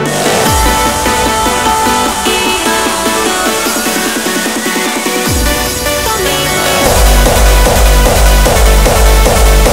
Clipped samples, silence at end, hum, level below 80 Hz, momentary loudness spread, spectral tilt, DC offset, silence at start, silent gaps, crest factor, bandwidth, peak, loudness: 0.5%; 0 s; none; -12 dBFS; 4 LU; -3.5 dB/octave; 0.9%; 0 s; none; 10 dB; 16.5 kHz; 0 dBFS; -10 LUFS